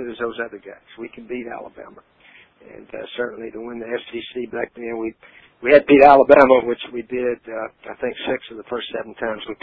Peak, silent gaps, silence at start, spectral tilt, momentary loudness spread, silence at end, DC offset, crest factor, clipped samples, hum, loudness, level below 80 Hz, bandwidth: 0 dBFS; none; 0 s; -7 dB/octave; 23 LU; 0.1 s; under 0.1%; 20 dB; under 0.1%; none; -18 LUFS; -54 dBFS; 5 kHz